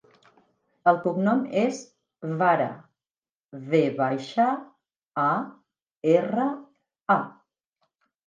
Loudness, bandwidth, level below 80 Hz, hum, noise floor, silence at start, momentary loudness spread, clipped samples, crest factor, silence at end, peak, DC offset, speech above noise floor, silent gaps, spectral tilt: -25 LUFS; 9.6 kHz; -78 dBFS; none; under -90 dBFS; 0.85 s; 17 LU; under 0.1%; 20 dB; 0.95 s; -6 dBFS; under 0.1%; over 66 dB; 3.11-3.23 s, 4.96-5.07 s, 5.82-5.86 s, 7.01-7.06 s; -7 dB/octave